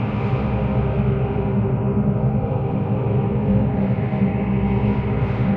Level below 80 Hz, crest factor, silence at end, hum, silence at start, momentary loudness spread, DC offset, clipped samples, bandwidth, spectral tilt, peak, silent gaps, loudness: -32 dBFS; 12 dB; 0 s; none; 0 s; 2 LU; under 0.1%; under 0.1%; 4.3 kHz; -11.5 dB/octave; -6 dBFS; none; -21 LUFS